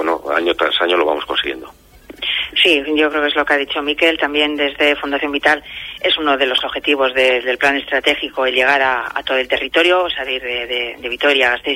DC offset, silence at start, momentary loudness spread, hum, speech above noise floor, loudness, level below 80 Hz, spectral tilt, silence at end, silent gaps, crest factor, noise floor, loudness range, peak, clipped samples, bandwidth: under 0.1%; 0 s; 7 LU; none; 20 dB; -15 LUFS; -48 dBFS; -2.5 dB/octave; 0 s; none; 16 dB; -37 dBFS; 1 LU; 0 dBFS; under 0.1%; 16.5 kHz